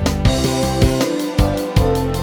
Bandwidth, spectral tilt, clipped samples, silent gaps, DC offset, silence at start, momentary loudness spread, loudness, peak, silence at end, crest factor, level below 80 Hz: over 20 kHz; -5.5 dB/octave; under 0.1%; none; under 0.1%; 0 s; 2 LU; -17 LUFS; 0 dBFS; 0 s; 16 dB; -24 dBFS